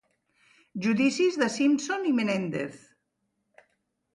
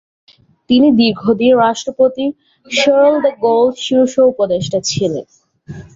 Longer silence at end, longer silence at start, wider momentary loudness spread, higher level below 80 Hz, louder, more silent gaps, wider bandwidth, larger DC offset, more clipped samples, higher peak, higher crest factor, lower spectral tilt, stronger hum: first, 1.35 s vs 0.15 s; about the same, 0.75 s vs 0.7 s; about the same, 10 LU vs 9 LU; second, -74 dBFS vs -52 dBFS; second, -26 LUFS vs -13 LUFS; neither; first, 11.5 kHz vs 7.8 kHz; neither; neither; second, -12 dBFS vs -2 dBFS; about the same, 16 dB vs 12 dB; about the same, -5 dB/octave vs -4.5 dB/octave; neither